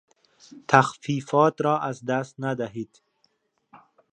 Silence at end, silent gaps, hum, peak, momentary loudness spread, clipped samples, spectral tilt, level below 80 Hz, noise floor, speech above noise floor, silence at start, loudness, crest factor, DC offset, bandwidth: 1.3 s; none; none; 0 dBFS; 15 LU; under 0.1%; -6 dB/octave; -70 dBFS; -70 dBFS; 46 dB; 0.55 s; -24 LUFS; 26 dB; under 0.1%; 10 kHz